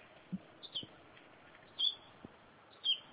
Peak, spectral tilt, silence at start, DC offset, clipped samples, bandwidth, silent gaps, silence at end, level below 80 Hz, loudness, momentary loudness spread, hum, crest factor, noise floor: -20 dBFS; -1 dB/octave; 0 s; under 0.1%; under 0.1%; 4 kHz; none; 0 s; -78 dBFS; -38 LUFS; 25 LU; none; 22 dB; -61 dBFS